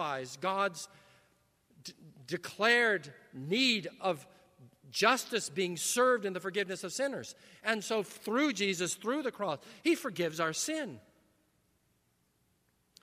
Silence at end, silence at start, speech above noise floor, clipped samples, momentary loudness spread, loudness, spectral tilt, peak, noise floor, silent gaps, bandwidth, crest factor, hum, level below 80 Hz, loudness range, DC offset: 2 s; 0 s; 41 dB; under 0.1%; 16 LU; -32 LUFS; -3 dB/octave; -10 dBFS; -74 dBFS; none; 15.5 kHz; 24 dB; none; -82 dBFS; 5 LU; under 0.1%